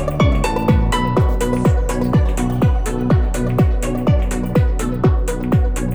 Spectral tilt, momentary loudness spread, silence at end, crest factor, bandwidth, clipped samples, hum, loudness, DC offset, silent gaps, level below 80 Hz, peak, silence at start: -7 dB/octave; 3 LU; 0 s; 14 dB; over 20 kHz; under 0.1%; none; -17 LUFS; under 0.1%; none; -20 dBFS; -2 dBFS; 0 s